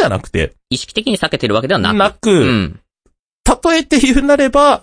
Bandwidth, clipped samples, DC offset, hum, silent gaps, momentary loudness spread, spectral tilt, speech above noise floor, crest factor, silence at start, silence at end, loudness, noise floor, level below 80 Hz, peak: 10.5 kHz; under 0.1%; under 0.1%; none; 3.19-3.44 s; 8 LU; -4.5 dB/octave; 48 dB; 14 dB; 0 s; 0.05 s; -14 LUFS; -61 dBFS; -30 dBFS; 0 dBFS